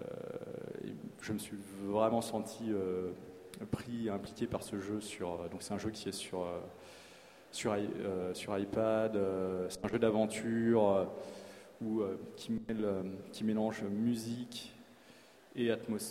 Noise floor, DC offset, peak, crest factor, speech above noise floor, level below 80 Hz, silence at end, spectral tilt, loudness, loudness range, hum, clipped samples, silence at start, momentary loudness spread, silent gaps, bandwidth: -60 dBFS; under 0.1%; -16 dBFS; 20 dB; 24 dB; -68 dBFS; 0 s; -5.5 dB/octave; -37 LUFS; 7 LU; none; under 0.1%; 0 s; 14 LU; none; 16 kHz